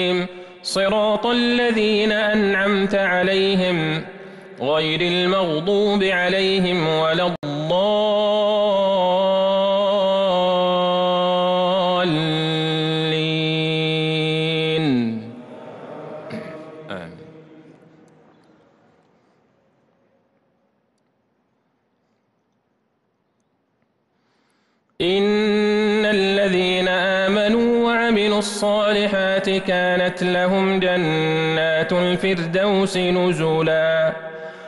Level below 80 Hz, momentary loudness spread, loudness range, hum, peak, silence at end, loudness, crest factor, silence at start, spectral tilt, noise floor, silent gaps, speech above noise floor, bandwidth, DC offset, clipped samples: -54 dBFS; 11 LU; 7 LU; none; -10 dBFS; 0 s; -19 LUFS; 10 dB; 0 s; -5.5 dB/octave; -68 dBFS; 7.38-7.42 s; 50 dB; 12 kHz; under 0.1%; under 0.1%